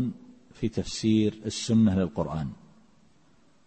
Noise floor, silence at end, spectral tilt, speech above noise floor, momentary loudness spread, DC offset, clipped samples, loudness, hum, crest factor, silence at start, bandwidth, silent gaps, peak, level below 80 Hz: -63 dBFS; 1.1 s; -6 dB/octave; 37 dB; 12 LU; under 0.1%; under 0.1%; -27 LUFS; none; 16 dB; 0 s; 8.8 kHz; none; -12 dBFS; -52 dBFS